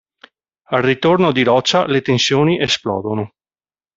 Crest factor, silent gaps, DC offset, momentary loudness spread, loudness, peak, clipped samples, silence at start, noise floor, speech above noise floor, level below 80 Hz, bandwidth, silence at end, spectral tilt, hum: 16 dB; none; under 0.1%; 8 LU; -15 LUFS; -2 dBFS; under 0.1%; 0.7 s; under -90 dBFS; over 75 dB; -54 dBFS; 7.8 kHz; 0.7 s; -5 dB/octave; none